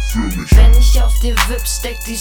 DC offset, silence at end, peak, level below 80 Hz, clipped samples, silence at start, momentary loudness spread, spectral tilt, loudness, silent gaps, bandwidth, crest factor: under 0.1%; 0 s; 0 dBFS; -12 dBFS; 0.1%; 0 s; 10 LU; -4.5 dB/octave; -14 LUFS; none; 18.5 kHz; 12 dB